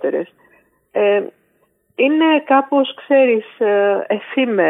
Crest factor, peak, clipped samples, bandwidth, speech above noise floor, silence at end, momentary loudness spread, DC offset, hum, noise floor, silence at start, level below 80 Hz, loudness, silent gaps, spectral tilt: 14 dB; -2 dBFS; under 0.1%; 3.9 kHz; 46 dB; 0 s; 12 LU; under 0.1%; none; -61 dBFS; 0 s; -80 dBFS; -16 LUFS; none; -8 dB/octave